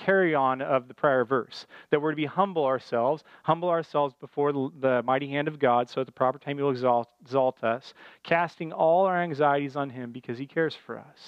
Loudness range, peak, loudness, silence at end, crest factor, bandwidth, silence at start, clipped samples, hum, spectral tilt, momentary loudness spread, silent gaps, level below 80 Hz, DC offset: 1 LU; -8 dBFS; -27 LUFS; 0 s; 18 dB; 8 kHz; 0 s; under 0.1%; none; -7.5 dB/octave; 9 LU; none; -78 dBFS; under 0.1%